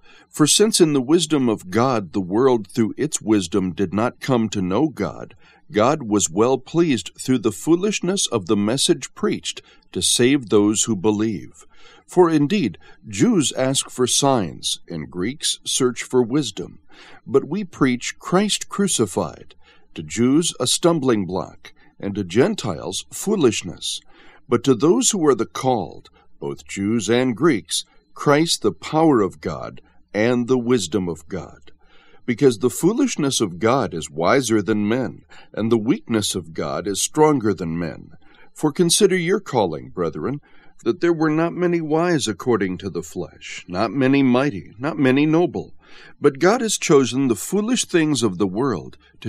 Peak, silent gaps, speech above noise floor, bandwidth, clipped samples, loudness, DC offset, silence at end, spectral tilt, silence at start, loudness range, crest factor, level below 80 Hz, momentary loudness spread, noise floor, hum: -2 dBFS; none; 30 dB; 15 kHz; under 0.1%; -20 LUFS; 0.4%; 0 s; -4.5 dB/octave; 0.35 s; 3 LU; 18 dB; -54 dBFS; 12 LU; -50 dBFS; none